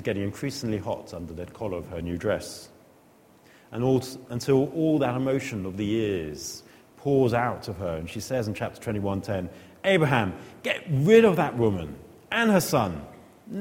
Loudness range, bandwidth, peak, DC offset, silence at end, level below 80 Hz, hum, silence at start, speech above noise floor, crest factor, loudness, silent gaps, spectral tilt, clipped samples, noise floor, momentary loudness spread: 8 LU; 16.5 kHz; -4 dBFS; under 0.1%; 0 s; -54 dBFS; none; 0 s; 31 dB; 22 dB; -26 LUFS; none; -6 dB/octave; under 0.1%; -56 dBFS; 15 LU